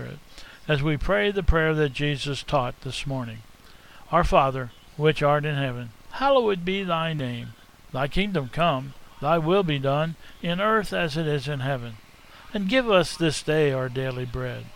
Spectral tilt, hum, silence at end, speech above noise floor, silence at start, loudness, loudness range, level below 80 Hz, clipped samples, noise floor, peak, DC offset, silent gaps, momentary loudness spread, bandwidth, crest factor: -6 dB/octave; none; 0 s; 24 dB; 0 s; -25 LUFS; 2 LU; -38 dBFS; under 0.1%; -48 dBFS; -4 dBFS; under 0.1%; none; 13 LU; 16 kHz; 22 dB